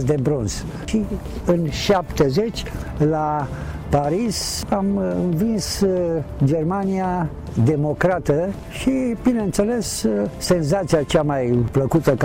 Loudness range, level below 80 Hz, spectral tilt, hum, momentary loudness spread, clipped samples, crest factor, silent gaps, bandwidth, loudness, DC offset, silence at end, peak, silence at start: 2 LU; -36 dBFS; -6 dB/octave; none; 6 LU; under 0.1%; 12 dB; none; 17 kHz; -21 LUFS; under 0.1%; 0 s; -8 dBFS; 0 s